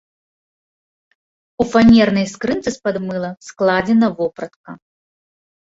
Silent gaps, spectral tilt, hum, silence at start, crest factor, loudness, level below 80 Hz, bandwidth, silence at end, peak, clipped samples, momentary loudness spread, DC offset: 4.56-4.64 s; -6 dB/octave; none; 1.6 s; 16 dB; -16 LUFS; -46 dBFS; 7.8 kHz; 0.95 s; -2 dBFS; under 0.1%; 15 LU; under 0.1%